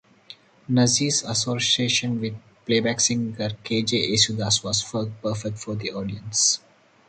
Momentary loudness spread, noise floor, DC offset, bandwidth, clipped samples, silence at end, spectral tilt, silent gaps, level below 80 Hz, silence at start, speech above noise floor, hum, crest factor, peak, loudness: 11 LU; -49 dBFS; under 0.1%; 9.4 kHz; under 0.1%; 0.5 s; -3 dB/octave; none; -56 dBFS; 0.3 s; 25 dB; none; 20 dB; -4 dBFS; -22 LUFS